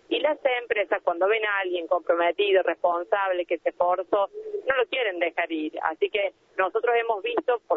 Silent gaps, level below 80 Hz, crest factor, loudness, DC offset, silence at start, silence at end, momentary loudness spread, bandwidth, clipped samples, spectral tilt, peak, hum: none; -70 dBFS; 20 dB; -25 LUFS; under 0.1%; 0.1 s; 0 s; 6 LU; 4.1 kHz; under 0.1%; -5 dB/octave; -6 dBFS; none